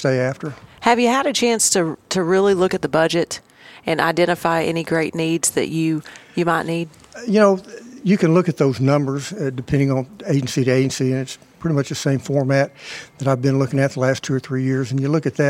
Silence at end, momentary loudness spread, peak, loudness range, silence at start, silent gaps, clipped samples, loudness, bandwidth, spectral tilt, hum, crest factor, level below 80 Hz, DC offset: 0 s; 10 LU; 0 dBFS; 3 LU; 0 s; none; under 0.1%; -19 LUFS; 16 kHz; -5 dB/octave; none; 18 dB; -54 dBFS; under 0.1%